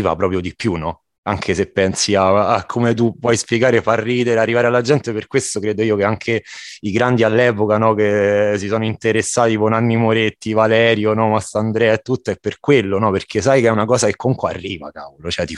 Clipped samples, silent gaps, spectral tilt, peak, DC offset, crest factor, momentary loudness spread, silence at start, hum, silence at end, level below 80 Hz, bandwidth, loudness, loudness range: under 0.1%; 1.18-1.23 s; -5 dB/octave; 0 dBFS; under 0.1%; 16 dB; 8 LU; 0 s; none; 0 s; -48 dBFS; 12 kHz; -16 LUFS; 2 LU